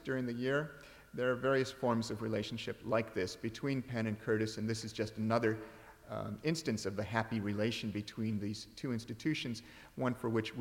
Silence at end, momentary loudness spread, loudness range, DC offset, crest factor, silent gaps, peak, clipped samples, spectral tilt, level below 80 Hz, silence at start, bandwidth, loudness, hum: 0 s; 9 LU; 2 LU; under 0.1%; 20 dB; none; -18 dBFS; under 0.1%; -5.5 dB/octave; -66 dBFS; 0 s; 16.5 kHz; -37 LUFS; none